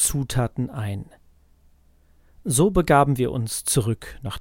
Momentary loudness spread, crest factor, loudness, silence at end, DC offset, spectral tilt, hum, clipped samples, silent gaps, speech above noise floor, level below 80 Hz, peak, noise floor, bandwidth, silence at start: 14 LU; 20 dB; -22 LUFS; 0 s; under 0.1%; -5 dB/octave; none; under 0.1%; none; 34 dB; -40 dBFS; -4 dBFS; -56 dBFS; 17 kHz; 0 s